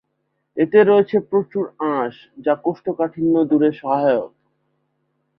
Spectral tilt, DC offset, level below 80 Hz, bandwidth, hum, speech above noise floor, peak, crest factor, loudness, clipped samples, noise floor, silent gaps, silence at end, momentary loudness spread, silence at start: -10.5 dB/octave; under 0.1%; -64 dBFS; 5.2 kHz; none; 54 dB; -2 dBFS; 18 dB; -19 LUFS; under 0.1%; -72 dBFS; none; 1.1 s; 11 LU; 0.55 s